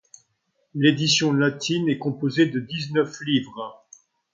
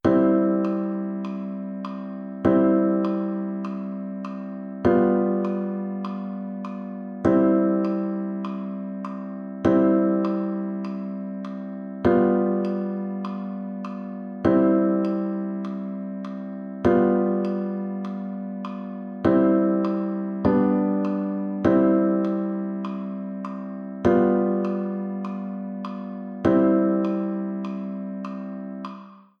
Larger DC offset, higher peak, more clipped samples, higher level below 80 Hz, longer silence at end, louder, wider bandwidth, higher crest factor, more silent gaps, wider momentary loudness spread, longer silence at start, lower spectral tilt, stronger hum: neither; about the same, -6 dBFS vs -6 dBFS; neither; second, -68 dBFS vs -56 dBFS; first, 0.6 s vs 0.2 s; about the same, -22 LUFS vs -24 LUFS; first, 7.6 kHz vs 6.4 kHz; about the same, 18 dB vs 18 dB; neither; about the same, 15 LU vs 14 LU; first, 0.75 s vs 0.05 s; second, -4.5 dB/octave vs -10 dB/octave; neither